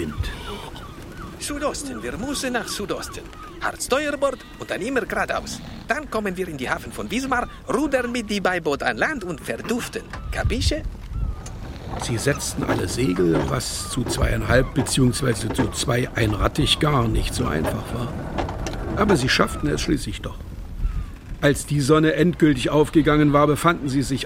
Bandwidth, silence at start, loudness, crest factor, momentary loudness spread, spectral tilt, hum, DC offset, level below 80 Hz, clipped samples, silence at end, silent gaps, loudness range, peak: 16.5 kHz; 0 s; -22 LUFS; 20 dB; 15 LU; -5 dB/octave; none; under 0.1%; -34 dBFS; under 0.1%; 0 s; none; 6 LU; -2 dBFS